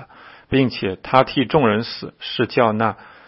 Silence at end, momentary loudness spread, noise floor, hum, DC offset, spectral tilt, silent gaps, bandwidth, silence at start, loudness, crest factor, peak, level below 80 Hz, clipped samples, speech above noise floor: 0.2 s; 10 LU; -44 dBFS; none; under 0.1%; -9 dB/octave; none; 5.8 kHz; 0 s; -19 LUFS; 20 dB; 0 dBFS; -50 dBFS; under 0.1%; 25 dB